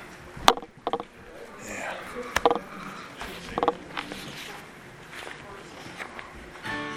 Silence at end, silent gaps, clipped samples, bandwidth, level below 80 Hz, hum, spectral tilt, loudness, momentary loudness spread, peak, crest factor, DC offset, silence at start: 0 s; none; under 0.1%; 17 kHz; -54 dBFS; none; -3 dB/octave; -30 LUFS; 19 LU; 0 dBFS; 32 dB; under 0.1%; 0 s